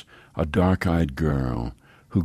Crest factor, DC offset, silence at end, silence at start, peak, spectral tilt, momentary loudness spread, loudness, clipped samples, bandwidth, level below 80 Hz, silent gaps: 16 dB; under 0.1%; 0 s; 0.35 s; -8 dBFS; -8 dB/octave; 11 LU; -24 LUFS; under 0.1%; 14.5 kHz; -36 dBFS; none